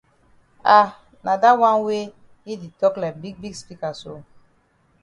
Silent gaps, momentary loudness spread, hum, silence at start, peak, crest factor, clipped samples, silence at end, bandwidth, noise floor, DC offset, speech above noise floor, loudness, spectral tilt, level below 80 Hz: none; 20 LU; none; 0.65 s; 0 dBFS; 22 dB; under 0.1%; 0.8 s; 11 kHz; -61 dBFS; under 0.1%; 42 dB; -19 LUFS; -5 dB/octave; -60 dBFS